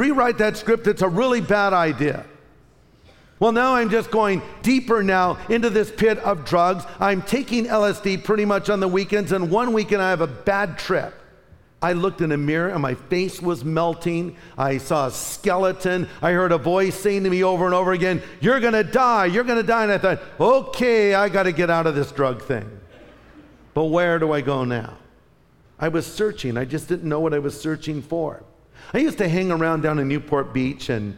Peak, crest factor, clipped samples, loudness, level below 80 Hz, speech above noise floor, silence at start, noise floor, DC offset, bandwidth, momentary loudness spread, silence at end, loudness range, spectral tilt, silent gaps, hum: -6 dBFS; 14 dB; under 0.1%; -21 LUFS; -48 dBFS; 35 dB; 0 s; -55 dBFS; under 0.1%; 17 kHz; 7 LU; 0 s; 6 LU; -6 dB/octave; none; none